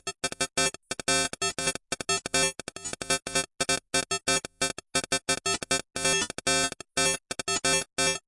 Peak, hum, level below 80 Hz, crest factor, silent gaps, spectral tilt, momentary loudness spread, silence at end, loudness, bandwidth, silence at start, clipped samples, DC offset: -10 dBFS; none; -56 dBFS; 20 dB; none; -1 dB/octave; 5 LU; 0.1 s; -27 LUFS; 11.5 kHz; 0.05 s; under 0.1%; under 0.1%